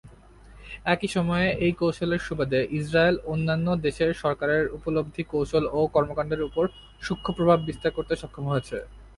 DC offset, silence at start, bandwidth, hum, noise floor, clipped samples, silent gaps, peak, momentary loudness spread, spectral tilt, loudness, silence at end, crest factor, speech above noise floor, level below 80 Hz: under 0.1%; 0.05 s; 11.5 kHz; none; -49 dBFS; under 0.1%; none; -6 dBFS; 8 LU; -6.5 dB/octave; -26 LUFS; 0.1 s; 20 dB; 24 dB; -46 dBFS